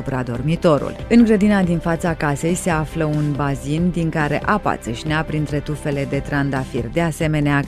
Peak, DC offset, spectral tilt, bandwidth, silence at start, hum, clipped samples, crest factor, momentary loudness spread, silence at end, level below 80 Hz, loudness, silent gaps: -2 dBFS; under 0.1%; -6.5 dB/octave; 14 kHz; 0 s; none; under 0.1%; 16 dB; 8 LU; 0 s; -36 dBFS; -19 LUFS; none